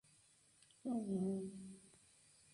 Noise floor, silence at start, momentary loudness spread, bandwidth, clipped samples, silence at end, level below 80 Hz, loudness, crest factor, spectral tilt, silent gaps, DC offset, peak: -71 dBFS; 0.85 s; 25 LU; 11.5 kHz; under 0.1%; 0.65 s; -80 dBFS; -44 LUFS; 16 dB; -7.5 dB/octave; none; under 0.1%; -30 dBFS